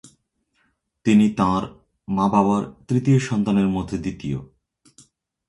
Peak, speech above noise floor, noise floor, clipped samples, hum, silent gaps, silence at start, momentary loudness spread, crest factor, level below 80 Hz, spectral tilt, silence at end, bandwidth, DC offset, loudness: -4 dBFS; 49 dB; -69 dBFS; under 0.1%; none; none; 1.05 s; 12 LU; 18 dB; -48 dBFS; -7.5 dB/octave; 1.05 s; 11 kHz; under 0.1%; -21 LUFS